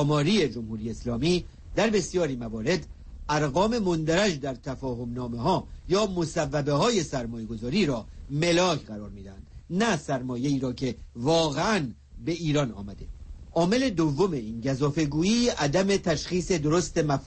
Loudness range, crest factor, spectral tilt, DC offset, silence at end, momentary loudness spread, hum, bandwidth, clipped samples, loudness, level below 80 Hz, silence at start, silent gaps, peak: 3 LU; 14 dB; -5 dB/octave; under 0.1%; 0 s; 11 LU; none; 8.8 kHz; under 0.1%; -27 LUFS; -46 dBFS; 0 s; none; -12 dBFS